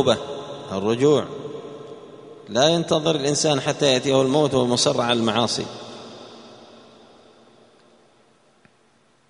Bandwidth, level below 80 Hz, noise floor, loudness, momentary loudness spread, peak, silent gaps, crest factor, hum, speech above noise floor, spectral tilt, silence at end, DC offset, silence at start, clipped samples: 10.5 kHz; -60 dBFS; -60 dBFS; -20 LUFS; 21 LU; -2 dBFS; none; 20 dB; none; 40 dB; -4 dB/octave; 2.75 s; under 0.1%; 0 s; under 0.1%